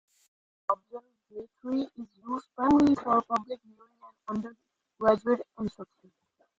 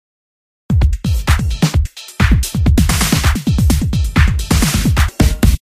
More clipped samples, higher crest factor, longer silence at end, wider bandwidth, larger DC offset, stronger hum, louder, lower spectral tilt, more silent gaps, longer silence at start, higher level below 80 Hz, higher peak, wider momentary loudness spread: neither; first, 22 dB vs 14 dB; first, 0.75 s vs 0.05 s; second, 7.6 kHz vs 16 kHz; neither; neither; second, -29 LUFS vs -15 LUFS; first, -7 dB/octave vs -5 dB/octave; neither; about the same, 0.7 s vs 0.7 s; second, -64 dBFS vs -16 dBFS; second, -10 dBFS vs 0 dBFS; first, 23 LU vs 3 LU